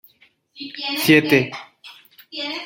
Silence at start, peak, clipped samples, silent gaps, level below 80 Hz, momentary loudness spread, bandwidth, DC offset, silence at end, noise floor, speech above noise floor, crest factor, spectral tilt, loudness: 0.55 s; -2 dBFS; under 0.1%; none; -64 dBFS; 22 LU; 17 kHz; under 0.1%; 0 s; -57 dBFS; 39 dB; 20 dB; -4.5 dB/octave; -18 LUFS